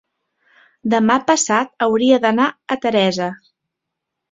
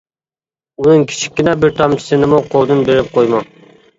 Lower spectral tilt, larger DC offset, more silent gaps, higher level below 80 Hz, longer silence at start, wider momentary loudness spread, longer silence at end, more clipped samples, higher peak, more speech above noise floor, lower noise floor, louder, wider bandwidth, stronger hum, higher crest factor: second, -3.5 dB/octave vs -6 dB/octave; neither; neither; second, -60 dBFS vs -46 dBFS; about the same, 0.85 s vs 0.8 s; first, 8 LU vs 4 LU; first, 0.95 s vs 0.55 s; neither; about the same, -2 dBFS vs 0 dBFS; second, 64 dB vs over 78 dB; second, -80 dBFS vs under -90 dBFS; second, -17 LUFS vs -13 LUFS; about the same, 8 kHz vs 8 kHz; neither; about the same, 16 dB vs 14 dB